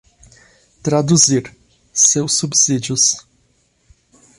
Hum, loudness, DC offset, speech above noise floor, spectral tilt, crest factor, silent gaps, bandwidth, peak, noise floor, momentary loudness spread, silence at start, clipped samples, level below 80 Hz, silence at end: none; -14 LUFS; under 0.1%; 45 dB; -3 dB/octave; 18 dB; none; 11.5 kHz; 0 dBFS; -60 dBFS; 11 LU; 0.85 s; under 0.1%; -54 dBFS; 1.2 s